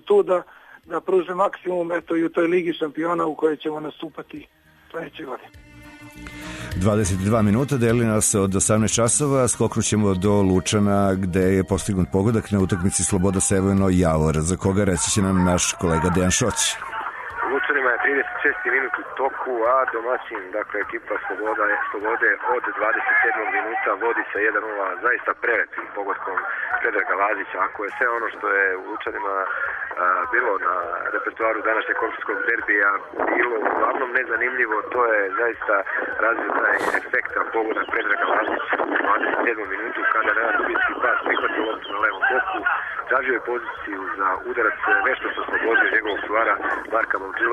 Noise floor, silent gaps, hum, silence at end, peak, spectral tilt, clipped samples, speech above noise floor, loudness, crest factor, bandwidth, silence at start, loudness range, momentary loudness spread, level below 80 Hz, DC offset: -43 dBFS; none; none; 0 s; -6 dBFS; -4.5 dB/octave; under 0.1%; 21 dB; -21 LUFS; 14 dB; 13.5 kHz; 0.05 s; 4 LU; 8 LU; -46 dBFS; under 0.1%